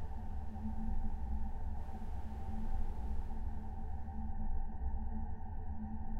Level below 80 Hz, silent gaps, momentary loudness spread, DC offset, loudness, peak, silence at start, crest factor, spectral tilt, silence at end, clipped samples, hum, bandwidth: -40 dBFS; none; 3 LU; under 0.1%; -45 LUFS; -24 dBFS; 0 s; 12 dB; -9.5 dB/octave; 0 s; under 0.1%; none; 2.7 kHz